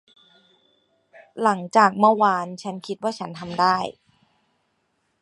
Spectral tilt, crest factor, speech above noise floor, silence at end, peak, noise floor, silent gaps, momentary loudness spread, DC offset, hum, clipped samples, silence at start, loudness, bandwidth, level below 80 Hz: -5 dB/octave; 22 dB; 50 dB; 1.3 s; -2 dBFS; -71 dBFS; none; 16 LU; under 0.1%; none; under 0.1%; 1.35 s; -21 LUFS; 11.5 kHz; -68 dBFS